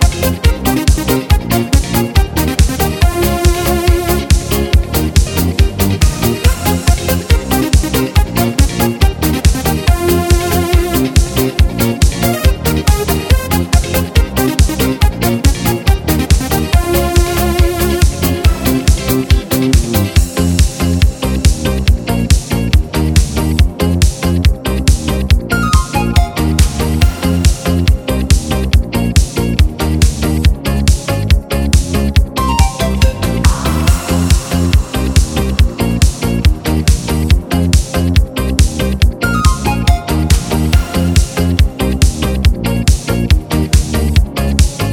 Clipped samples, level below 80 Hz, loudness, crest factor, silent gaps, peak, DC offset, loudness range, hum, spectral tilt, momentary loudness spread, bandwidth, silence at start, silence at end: under 0.1%; -14 dBFS; -13 LUFS; 12 dB; none; 0 dBFS; under 0.1%; 1 LU; none; -5.5 dB/octave; 1 LU; over 20 kHz; 0 s; 0 s